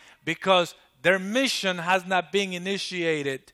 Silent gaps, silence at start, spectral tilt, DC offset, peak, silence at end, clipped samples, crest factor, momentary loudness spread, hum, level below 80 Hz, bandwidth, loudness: none; 0.25 s; -3.5 dB/octave; under 0.1%; -6 dBFS; 0.15 s; under 0.1%; 20 dB; 7 LU; none; -70 dBFS; 15 kHz; -25 LUFS